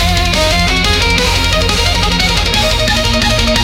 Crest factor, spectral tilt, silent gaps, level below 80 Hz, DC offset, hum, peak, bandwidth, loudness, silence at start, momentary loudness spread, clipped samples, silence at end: 12 dB; -3.5 dB/octave; none; -18 dBFS; under 0.1%; none; 0 dBFS; 17 kHz; -11 LUFS; 0 s; 1 LU; under 0.1%; 0 s